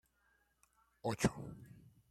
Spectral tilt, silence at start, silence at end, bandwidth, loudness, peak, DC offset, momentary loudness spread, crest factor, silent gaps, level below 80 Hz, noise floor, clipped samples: -5.5 dB/octave; 1.05 s; 0.2 s; 15.5 kHz; -40 LUFS; -16 dBFS; under 0.1%; 20 LU; 28 dB; none; -64 dBFS; -77 dBFS; under 0.1%